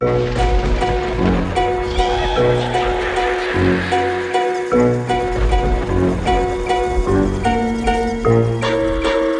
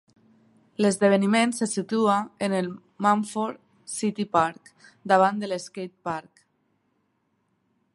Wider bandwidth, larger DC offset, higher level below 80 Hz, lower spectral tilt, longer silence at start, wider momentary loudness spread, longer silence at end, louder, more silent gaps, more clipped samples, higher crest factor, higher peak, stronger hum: about the same, 10.5 kHz vs 11.5 kHz; neither; first, -24 dBFS vs -70 dBFS; first, -6.5 dB/octave vs -5 dB/octave; second, 0 s vs 0.8 s; second, 3 LU vs 14 LU; second, 0 s vs 1.75 s; first, -17 LUFS vs -25 LUFS; neither; neither; second, 14 dB vs 22 dB; about the same, -2 dBFS vs -4 dBFS; neither